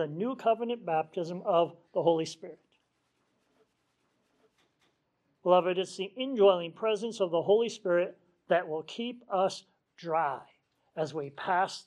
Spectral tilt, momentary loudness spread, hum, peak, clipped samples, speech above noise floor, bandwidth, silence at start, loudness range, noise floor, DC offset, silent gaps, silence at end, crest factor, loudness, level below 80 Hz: -5 dB/octave; 12 LU; none; -12 dBFS; under 0.1%; 47 dB; 11 kHz; 0 s; 6 LU; -76 dBFS; under 0.1%; none; 0.05 s; 20 dB; -30 LUFS; -86 dBFS